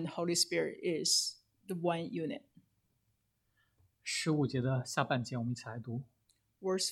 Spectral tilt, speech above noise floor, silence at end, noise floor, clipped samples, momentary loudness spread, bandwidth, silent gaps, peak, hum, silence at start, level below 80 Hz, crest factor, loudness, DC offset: -4 dB/octave; 44 dB; 0 s; -79 dBFS; under 0.1%; 14 LU; 16 kHz; none; -14 dBFS; none; 0 s; -76 dBFS; 22 dB; -35 LUFS; under 0.1%